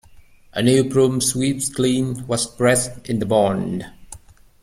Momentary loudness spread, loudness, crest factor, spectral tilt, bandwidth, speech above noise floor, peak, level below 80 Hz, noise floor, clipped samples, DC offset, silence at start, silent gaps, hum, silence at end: 9 LU; -19 LUFS; 16 dB; -4.5 dB/octave; 15.5 kHz; 28 dB; -4 dBFS; -48 dBFS; -47 dBFS; under 0.1%; under 0.1%; 0.15 s; none; none; 0.45 s